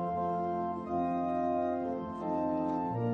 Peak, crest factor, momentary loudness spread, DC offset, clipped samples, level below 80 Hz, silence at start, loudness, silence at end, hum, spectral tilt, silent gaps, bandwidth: -20 dBFS; 12 dB; 4 LU; under 0.1%; under 0.1%; -64 dBFS; 0 s; -33 LUFS; 0 s; none; -10 dB/octave; none; 6.6 kHz